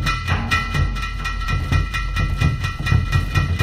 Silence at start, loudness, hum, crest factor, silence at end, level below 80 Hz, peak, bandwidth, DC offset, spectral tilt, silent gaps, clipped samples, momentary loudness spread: 0 s; -21 LUFS; none; 16 dB; 0 s; -24 dBFS; -4 dBFS; 13 kHz; under 0.1%; -5.5 dB/octave; none; under 0.1%; 5 LU